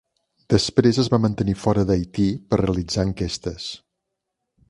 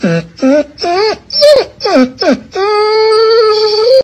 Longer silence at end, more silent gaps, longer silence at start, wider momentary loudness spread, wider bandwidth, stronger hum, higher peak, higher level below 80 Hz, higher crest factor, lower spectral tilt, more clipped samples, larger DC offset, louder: first, 0.95 s vs 0 s; neither; first, 0.5 s vs 0 s; first, 11 LU vs 6 LU; about the same, 11.5 kHz vs 12.5 kHz; neither; about the same, 0 dBFS vs 0 dBFS; first, -40 dBFS vs -48 dBFS; first, 22 dB vs 10 dB; about the same, -6 dB/octave vs -5 dB/octave; second, under 0.1% vs 0.6%; neither; second, -21 LUFS vs -9 LUFS